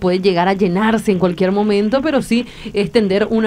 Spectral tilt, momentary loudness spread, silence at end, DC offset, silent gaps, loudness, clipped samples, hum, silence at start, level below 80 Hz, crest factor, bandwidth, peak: -6.5 dB/octave; 4 LU; 0 s; under 0.1%; none; -16 LUFS; under 0.1%; none; 0 s; -44 dBFS; 14 dB; 14.5 kHz; 0 dBFS